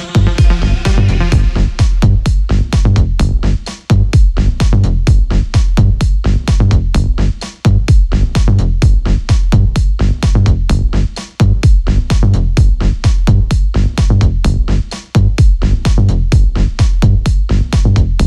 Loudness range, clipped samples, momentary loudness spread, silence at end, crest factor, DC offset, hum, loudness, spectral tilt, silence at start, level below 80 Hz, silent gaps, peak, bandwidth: 1 LU; under 0.1%; 3 LU; 0 s; 8 dB; under 0.1%; none; -13 LUFS; -6.5 dB/octave; 0 s; -12 dBFS; none; 0 dBFS; 10 kHz